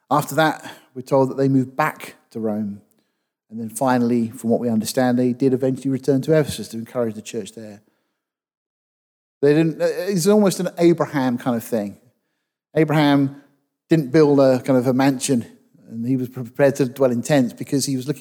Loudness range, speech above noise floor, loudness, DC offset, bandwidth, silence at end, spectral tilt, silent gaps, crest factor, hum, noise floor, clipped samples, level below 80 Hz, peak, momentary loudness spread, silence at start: 6 LU; 59 dB; -19 LUFS; under 0.1%; over 20 kHz; 0 s; -6 dB/octave; 8.57-9.41 s; 16 dB; none; -78 dBFS; under 0.1%; -64 dBFS; -4 dBFS; 14 LU; 0.1 s